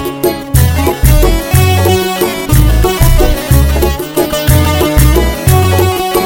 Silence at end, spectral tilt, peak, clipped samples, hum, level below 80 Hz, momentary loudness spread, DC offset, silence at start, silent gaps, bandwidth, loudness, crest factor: 0 s; -5.5 dB/octave; 0 dBFS; 0.3%; none; -14 dBFS; 4 LU; under 0.1%; 0 s; none; 17.5 kHz; -10 LUFS; 8 dB